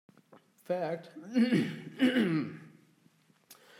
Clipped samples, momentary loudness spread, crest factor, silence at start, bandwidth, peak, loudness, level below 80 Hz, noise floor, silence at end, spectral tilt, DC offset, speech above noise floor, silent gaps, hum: under 0.1%; 13 LU; 18 dB; 0.7 s; 15.5 kHz; -16 dBFS; -31 LUFS; -88 dBFS; -67 dBFS; 0.25 s; -6.5 dB/octave; under 0.1%; 36 dB; none; none